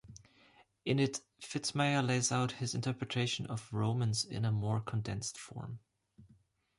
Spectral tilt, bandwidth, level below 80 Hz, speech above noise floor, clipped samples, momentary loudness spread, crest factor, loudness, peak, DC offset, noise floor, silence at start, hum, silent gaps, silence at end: -4.5 dB/octave; 11.5 kHz; -64 dBFS; 33 dB; under 0.1%; 12 LU; 16 dB; -35 LUFS; -20 dBFS; under 0.1%; -68 dBFS; 0.05 s; none; none; 0.55 s